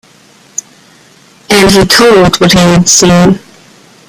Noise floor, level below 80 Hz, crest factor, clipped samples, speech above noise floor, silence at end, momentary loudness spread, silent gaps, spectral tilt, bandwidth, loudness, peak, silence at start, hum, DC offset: -41 dBFS; -32 dBFS; 8 dB; 0.6%; 36 dB; 0.7 s; 17 LU; none; -4 dB/octave; over 20 kHz; -5 LUFS; 0 dBFS; 1.5 s; none; under 0.1%